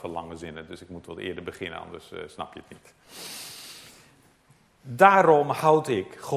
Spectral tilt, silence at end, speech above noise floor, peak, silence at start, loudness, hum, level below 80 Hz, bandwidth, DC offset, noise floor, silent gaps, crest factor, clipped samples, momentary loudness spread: -5 dB/octave; 0 s; 35 dB; 0 dBFS; 0.05 s; -22 LUFS; none; -60 dBFS; 15.5 kHz; under 0.1%; -61 dBFS; none; 26 dB; under 0.1%; 23 LU